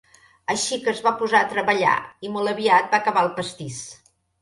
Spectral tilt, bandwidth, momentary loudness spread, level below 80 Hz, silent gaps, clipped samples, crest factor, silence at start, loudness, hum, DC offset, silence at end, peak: -3 dB/octave; 11.5 kHz; 15 LU; -66 dBFS; none; under 0.1%; 20 dB; 0.5 s; -21 LUFS; none; under 0.1%; 0.45 s; -2 dBFS